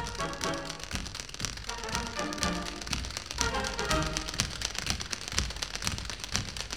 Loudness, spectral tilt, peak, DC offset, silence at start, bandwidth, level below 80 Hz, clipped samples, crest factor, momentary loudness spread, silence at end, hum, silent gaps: -33 LUFS; -2.5 dB/octave; -4 dBFS; 0.2%; 0 s; 19.5 kHz; -42 dBFS; under 0.1%; 30 dB; 7 LU; 0 s; none; none